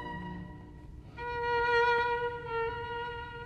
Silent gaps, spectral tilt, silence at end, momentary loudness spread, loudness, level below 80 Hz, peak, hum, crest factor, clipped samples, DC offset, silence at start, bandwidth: none; -5.5 dB/octave; 0 s; 22 LU; -32 LUFS; -52 dBFS; -18 dBFS; none; 16 dB; under 0.1%; under 0.1%; 0 s; 8.6 kHz